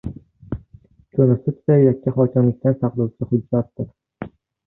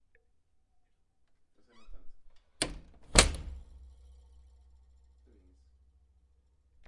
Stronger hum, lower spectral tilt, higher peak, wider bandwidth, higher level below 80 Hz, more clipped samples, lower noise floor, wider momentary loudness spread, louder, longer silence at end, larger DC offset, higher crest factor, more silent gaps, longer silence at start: neither; first, -14 dB/octave vs -2 dB/octave; about the same, -4 dBFS vs -2 dBFS; second, 2.8 kHz vs 11.5 kHz; about the same, -48 dBFS vs -44 dBFS; neither; second, -50 dBFS vs -70 dBFS; second, 19 LU vs 26 LU; first, -19 LUFS vs -28 LUFS; second, 0.4 s vs 3 s; neither; second, 16 dB vs 36 dB; neither; second, 0.05 s vs 1.8 s